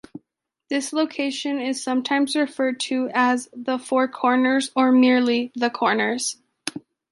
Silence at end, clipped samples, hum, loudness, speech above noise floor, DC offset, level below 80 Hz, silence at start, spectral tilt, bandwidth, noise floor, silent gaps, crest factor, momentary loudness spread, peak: 0.35 s; under 0.1%; none; -21 LUFS; 57 dB; under 0.1%; -74 dBFS; 0.15 s; -3 dB/octave; 11.5 kHz; -78 dBFS; none; 16 dB; 10 LU; -6 dBFS